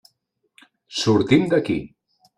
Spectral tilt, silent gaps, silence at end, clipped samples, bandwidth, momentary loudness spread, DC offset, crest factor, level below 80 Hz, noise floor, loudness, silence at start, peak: -6 dB/octave; none; 0.5 s; under 0.1%; 11 kHz; 11 LU; under 0.1%; 20 dB; -54 dBFS; -72 dBFS; -20 LUFS; 0.9 s; -2 dBFS